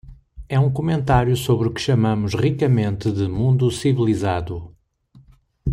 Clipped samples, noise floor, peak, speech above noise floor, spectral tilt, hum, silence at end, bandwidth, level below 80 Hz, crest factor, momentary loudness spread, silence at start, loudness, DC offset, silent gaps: under 0.1%; -52 dBFS; -4 dBFS; 34 dB; -7 dB/octave; none; 0 s; 13.5 kHz; -38 dBFS; 14 dB; 6 LU; 0.05 s; -20 LUFS; under 0.1%; none